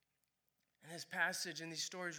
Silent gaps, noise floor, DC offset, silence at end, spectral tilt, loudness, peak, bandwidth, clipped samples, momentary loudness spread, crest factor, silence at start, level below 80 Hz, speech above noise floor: none; -85 dBFS; under 0.1%; 0 s; -1.5 dB/octave; -41 LUFS; -24 dBFS; over 20 kHz; under 0.1%; 13 LU; 22 dB; 0.85 s; under -90 dBFS; 42 dB